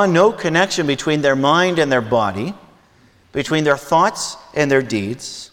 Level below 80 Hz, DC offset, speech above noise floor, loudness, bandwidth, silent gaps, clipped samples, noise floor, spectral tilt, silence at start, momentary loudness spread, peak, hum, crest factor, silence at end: -54 dBFS; under 0.1%; 35 dB; -17 LUFS; 18 kHz; none; under 0.1%; -52 dBFS; -4.5 dB/octave; 0 s; 11 LU; 0 dBFS; none; 16 dB; 0.05 s